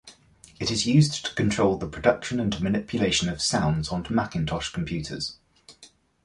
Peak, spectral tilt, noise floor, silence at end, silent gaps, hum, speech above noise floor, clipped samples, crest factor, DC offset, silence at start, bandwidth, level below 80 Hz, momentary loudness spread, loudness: -6 dBFS; -5 dB/octave; -55 dBFS; 0.4 s; none; none; 30 dB; under 0.1%; 20 dB; under 0.1%; 0.05 s; 11.5 kHz; -46 dBFS; 9 LU; -25 LUFS